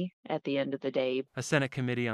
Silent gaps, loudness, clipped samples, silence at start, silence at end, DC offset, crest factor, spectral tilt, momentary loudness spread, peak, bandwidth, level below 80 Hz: 0.13-0.23 s; -32 LUFS; under 0.1%; 0 s; 0 s; under 0.1%; 20 dB; -5.5 dB/octave; 5 LU; -12 dBFS; 13.5 kHz; -74 dBFS